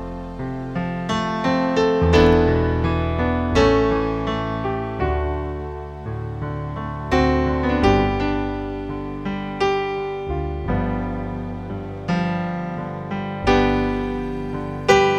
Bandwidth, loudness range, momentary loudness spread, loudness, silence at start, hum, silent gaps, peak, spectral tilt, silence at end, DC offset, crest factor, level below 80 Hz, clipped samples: 9.8 kHz; 7 LU; 12 LU; -22 LUFS; 0 s; none; none; -2 dBFS; -6.5 dB/octave; 0 s; under 0.1%; 18 dB; -32 dBFS; under 0.1%